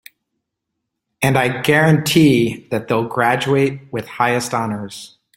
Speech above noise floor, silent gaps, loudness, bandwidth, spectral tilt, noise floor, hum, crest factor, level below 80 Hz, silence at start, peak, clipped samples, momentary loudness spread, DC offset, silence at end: 61 dB; none; -16 LUFS; 16.5 kHz; -5.5 dB/octave; -78 dBFS; none; 16 dB; -52 dBFS; 1.2 s; 0 dBFS; under 0.1%; 15 LU; under 0.1%; 0.3 s